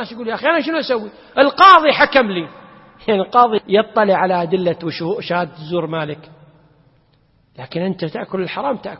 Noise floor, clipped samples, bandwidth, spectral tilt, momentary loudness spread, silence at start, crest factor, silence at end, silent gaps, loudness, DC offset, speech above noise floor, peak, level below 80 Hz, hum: -57 dBFS; under 0.1%; 7.2 kHz; -7 dB/octave; 15 LU; 0 s; 16 dB; 0 s; none; -16 LUFS; under 0.1%; 40 dB; 0 dBFS; -56 dBFS; none